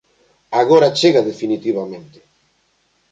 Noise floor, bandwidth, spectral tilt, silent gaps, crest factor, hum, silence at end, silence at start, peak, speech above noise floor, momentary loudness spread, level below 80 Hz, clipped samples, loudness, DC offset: -62 dBFS; 9.2 kHz; -5 dB/octave; none; 16 dB; none; 1.1 s; 0.5 s; -2 dBFS; 47 dB; 14 LU; -64 dBFS; under 0.1%; -15 LUFS; under 0.1%